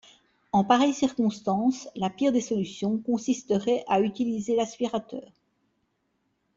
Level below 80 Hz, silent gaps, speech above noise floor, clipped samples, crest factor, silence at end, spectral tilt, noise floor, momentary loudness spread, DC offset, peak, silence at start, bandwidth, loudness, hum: -66 dBFS; none; 49 dB; under 0.1%; 22 dB; 1.3 s; -5.5 dB/octave; -74 dBFS; 8 LU; under 0.1%; -6 dBFS; 0.55 s; 7.8 kHz; -26 LUFS; none